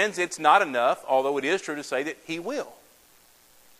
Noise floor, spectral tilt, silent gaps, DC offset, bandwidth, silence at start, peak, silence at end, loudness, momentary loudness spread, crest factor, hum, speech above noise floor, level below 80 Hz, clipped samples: -57 dBFS; -3 dB/octave; none; under 0.1%; 16 kHz; 0 s; -6 dBFS; 1.05 s; -25 LUFS; 13 LU; 22 dB; none; 32 dB; -74 dBFS; under 0.1%